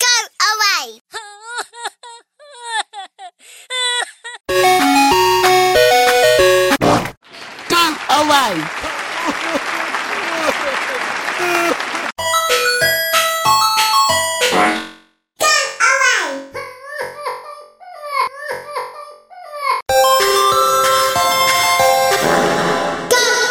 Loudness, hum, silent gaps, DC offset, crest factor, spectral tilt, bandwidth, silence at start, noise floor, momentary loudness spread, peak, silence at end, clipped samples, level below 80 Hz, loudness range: -14 LUFS; none; 1.01-1.05 s, 4.40-4.44 s, 7.17-7.21 s; under 0.1%; 16 dB; -1.5 dB/octave; 17 kHz; 0 s; -46 dBFS; 17 LU; 0 dBFS; 0 s; under 0.1%; -48 dBFS; 10 LU